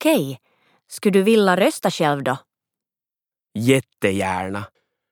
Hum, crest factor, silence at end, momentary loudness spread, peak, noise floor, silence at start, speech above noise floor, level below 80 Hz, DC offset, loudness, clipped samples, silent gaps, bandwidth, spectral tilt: none; 18 dB; 0.45 s; 17 LU; -2 dBFS; under -90 dBFS; 0 s; over 71 dB; -68 dBFS; under 0.1%; -20 LUFS; under 0.1%; none; 19.5 kHz; -5.5 dB/octave